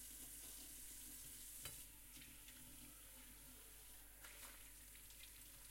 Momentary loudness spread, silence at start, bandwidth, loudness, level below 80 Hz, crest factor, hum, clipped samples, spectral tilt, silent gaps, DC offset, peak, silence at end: 6 LU; 0 s; 16.5 kHz; -56 LUFS; -68 dBFS; 22 dB; none; under 0.1%; -1 dB/octave; none; under 0.1%; -38 dBFS; 0 s